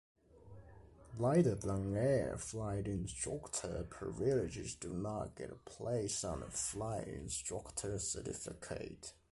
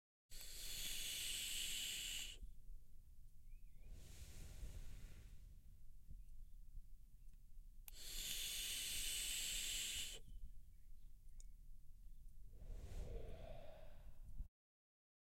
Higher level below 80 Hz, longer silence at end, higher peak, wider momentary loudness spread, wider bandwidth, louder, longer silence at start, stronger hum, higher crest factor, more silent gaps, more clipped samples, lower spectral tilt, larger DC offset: about the same, -56 dBFS vs -56 dBFS; second, 0.2 s vs 0.75 s; first, -20 dBFS vs -30 dBFS; second, 13 LU vs 25 LU; second, 11.5 kHz vs 16.5 kHz; first, -39 LUFS vs -46 LUFS; about the same, 0.35 s vs 0.3 s; neither; about the same, 20 dB vs 20 dB; neither; neither; first, -5 dB/octave vs 0 dB/octave; neither